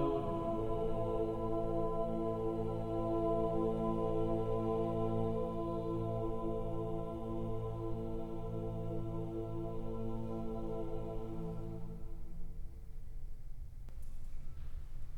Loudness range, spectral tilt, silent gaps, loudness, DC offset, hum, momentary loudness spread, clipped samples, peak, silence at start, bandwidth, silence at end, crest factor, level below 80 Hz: 11 LU; -9.5 dB/octave; none; -39 LUFS; under 0.1%; none; 17 LU; under 0.1%; -22 dBFS; 0 s; 4.3 kHz; 0 s; 14 dB; -44 dBFS